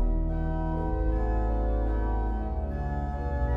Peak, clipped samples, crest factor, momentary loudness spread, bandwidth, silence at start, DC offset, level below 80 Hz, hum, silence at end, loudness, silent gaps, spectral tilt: -16 dBFS; under 0.1%; 10 dB; 3 LU; 3.5 kHz; 0 s; under 0.1%; -28 dBFS; none; 0 s; -30 LUFS; none; -10.5 dB/octave